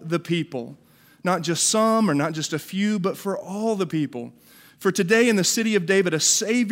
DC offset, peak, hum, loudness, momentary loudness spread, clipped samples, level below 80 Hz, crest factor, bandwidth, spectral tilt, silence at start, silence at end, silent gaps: under 0.1%; -6 dBFS; none; -22 LUFS; 12 LU; under 0.1%; -72 dBFS; 16 dB; 16 kHz; -3.5 dB/octave; 0 s; 0 s; none